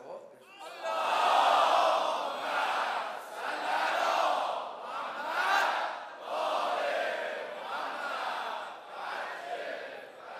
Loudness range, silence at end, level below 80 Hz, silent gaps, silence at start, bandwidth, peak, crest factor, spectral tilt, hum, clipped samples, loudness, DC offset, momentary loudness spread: 6 LU; 0 s; under -90 dBFS; none; 0 s; 15 kHz; -12 dBFS; 20 dB; -0.5 dB/octave; none; under 0.1%; -31 LUFS; under 0.1%; 15 LU